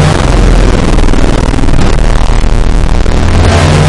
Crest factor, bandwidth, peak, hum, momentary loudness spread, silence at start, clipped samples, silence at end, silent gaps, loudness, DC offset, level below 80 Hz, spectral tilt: 4 dB; 11.5 kHz; 0 dBFS; none; 4 LU; 0 s; 1%; 0 s; none; -9 LUFS; under 0.1%; -8 dBFS; -6 dB/octave